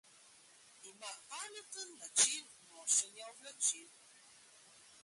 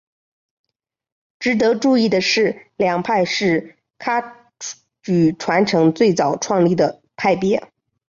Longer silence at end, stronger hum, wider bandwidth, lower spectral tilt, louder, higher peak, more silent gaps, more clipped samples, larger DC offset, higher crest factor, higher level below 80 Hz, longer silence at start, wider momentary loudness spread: first, 1.15 s vs 0.5 s; neither; first, 12 kHz vs 7.6 kHz; second, 2.5 dB/octave vs -5 dB/octave; second, -36 LUFS vs -18 LUFS; second, -14 dBFS vs -4 dBFS; neither; neither; neither; first, 26 dB vs 14 dB; second, -88 dBFS vs -58 dBFS; second, 0.85 s vs 1.4 s; first, 23 LU vs 12 LU